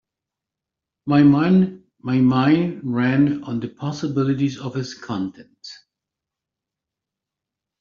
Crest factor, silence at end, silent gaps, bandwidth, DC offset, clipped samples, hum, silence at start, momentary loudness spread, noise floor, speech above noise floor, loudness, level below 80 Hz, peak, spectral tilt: 18 dB; 2.05 s; none; 7.2 kHz; under 0.1%; under 0.1%; none; 1.05 s; 18 LU; -86 dBFS; 67 dB; -20 LUFS; -60 dBFS; -4 dBFS; -7 dB/octave